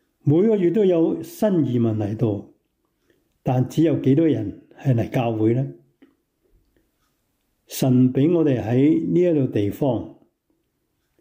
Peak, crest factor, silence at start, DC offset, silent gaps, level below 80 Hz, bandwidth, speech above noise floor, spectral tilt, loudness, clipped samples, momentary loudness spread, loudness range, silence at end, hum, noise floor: -8 dBFS; 12 dB; 0.25 s; under 0.1%; none; -60 dBFS; 16 kHz; 53 dB; -8.5 dB/octave; -20 LUFS; under 0.1%; 9 LU; 4 LU; 1.1 s; none; -72 dBFS